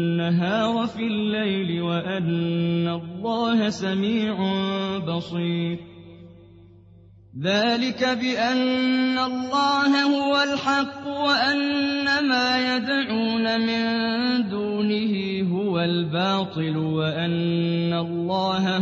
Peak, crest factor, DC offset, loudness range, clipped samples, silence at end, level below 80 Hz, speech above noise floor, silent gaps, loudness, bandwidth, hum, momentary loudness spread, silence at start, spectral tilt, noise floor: -8 dBFS; 16 dB; under 0.1%; 5 LU; under 0.1%; 0 s; -62 dBFS; 27 dB; none; -23 LUFS; 8 kHz; none; 5 LU; 0 s; -6 dB/octave; -50 dBFS